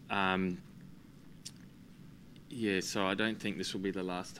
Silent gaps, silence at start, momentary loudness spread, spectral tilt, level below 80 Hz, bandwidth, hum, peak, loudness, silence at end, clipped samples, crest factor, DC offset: none; 0 s; 23 LU; -4.5 dB/octave; -68 dBFS; 16 kHz; none; -14 dBFS; -35 LUFS; 0 s; under 0.1%; 22 dB; under 0.1%